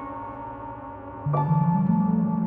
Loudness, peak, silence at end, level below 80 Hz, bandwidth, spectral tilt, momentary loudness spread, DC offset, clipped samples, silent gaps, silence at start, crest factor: -24 LUFS; -12 dBFS; 0 s; -52 dBFS; 3 kHz; -13 dB/octave; 15 LU; under 0.1%; under 0.1%; none; 0 s; 14 dB